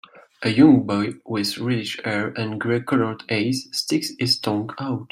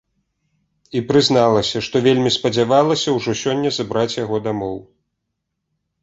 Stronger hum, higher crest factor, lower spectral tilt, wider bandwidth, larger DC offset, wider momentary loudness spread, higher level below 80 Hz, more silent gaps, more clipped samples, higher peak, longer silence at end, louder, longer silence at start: neither; about the same, 18 dB vs 18 dB; about the same, -5 dB/octave vs -5 dB/octave; first, 16 kHz vs 8.2 kHz; neither; about the same, 11 LU vs 10 LU; second, -60 dBFS vs -54 dBFS; neither; neither; about the same, -2 dBFS vs -2 dBFS; second, 0.05 s vs 1.2 s; second, -22 LUFS vs -18 LUFS; second, 0.4 s vs 0.95 s